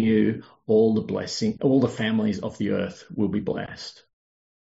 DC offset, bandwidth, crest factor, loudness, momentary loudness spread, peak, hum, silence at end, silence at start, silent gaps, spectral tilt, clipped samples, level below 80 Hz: under 0.1%; 7.8 kHz; 16 dB; -24 LUFS; 12 LU; -8 dBFS; none; 0.85 s; 0 s; none; -6 dB/octave; under 0.1%; -60 dBFS